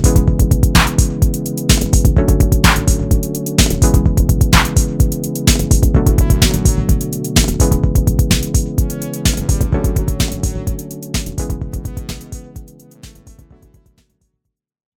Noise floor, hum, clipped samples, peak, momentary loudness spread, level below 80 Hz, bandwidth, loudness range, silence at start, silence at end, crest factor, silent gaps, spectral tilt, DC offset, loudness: -75 dBFS; none; under 0.1%; 0 dBFS; 11 LU; -18 dBFS; 19 kHz; 13 LU; 0 s; 1.65 s; 14 dB; none; -5 dB/octave; under 0.1%; -15 LUFS